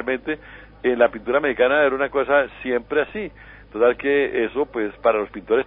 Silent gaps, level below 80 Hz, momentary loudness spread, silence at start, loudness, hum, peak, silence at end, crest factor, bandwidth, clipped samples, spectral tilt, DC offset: none; -50 dBFS; 10 LU; 0 s; -21 LUFS; none; -2 dBFS; 0 s; 18 dB; 4.1 kHz; under 0.1%; -9.5 dB/octave; under 0.1%